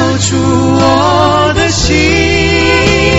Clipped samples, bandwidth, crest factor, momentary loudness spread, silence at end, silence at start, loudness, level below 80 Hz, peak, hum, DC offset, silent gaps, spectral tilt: 0.3%; 8.2 kHz; 8 dB; 2 LU; 0 s; 0 s; -9 LUFS; -24 dBFS; 0 dBFS; none; 0.9%; none; -4.5 dB/octave